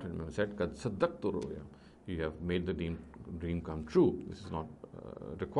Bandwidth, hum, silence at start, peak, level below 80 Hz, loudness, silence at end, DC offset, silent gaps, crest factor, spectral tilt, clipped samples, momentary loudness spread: 11 kHz; none; 0 s; -14 dBFS; -54 dBFS; -36 LUFS; 0 s; under 0.1%; none; 20 dB; -7.5 dB/octave; under 0.1%; 17 LU